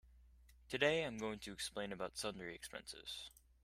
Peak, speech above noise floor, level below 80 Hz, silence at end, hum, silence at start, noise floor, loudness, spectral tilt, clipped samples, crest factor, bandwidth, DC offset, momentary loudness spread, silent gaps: -20 dBFS; 22 dB; -68 dBFS; 0.35 s; none; 0.05 s; -66 dBFS; -43 LUFS; -3 dB/octave; under 0.1%; 24 dB; 16 kHz; under 0.1%; 14 LU; none